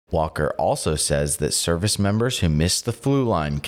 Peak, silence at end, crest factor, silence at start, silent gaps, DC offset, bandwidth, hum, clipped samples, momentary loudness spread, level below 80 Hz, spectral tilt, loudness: -10 dBFS; 0 s; 12 dB; 0.1 s; none; under 0.1%; 16.5 kHz; none; under 0.1%; 2 LU; -38 dBFS; -4.5 dB/octave; -21 LUFS